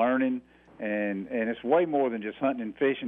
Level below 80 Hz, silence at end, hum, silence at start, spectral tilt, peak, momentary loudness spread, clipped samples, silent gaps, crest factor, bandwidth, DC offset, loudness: -68 dBFS; 0 s; none; 0 s; -9 dB/octave; -12 dBFS; 7 LU; under 0.1%; none; 16 dB; 3.8 kHz; under 0.1%; -28 LUFS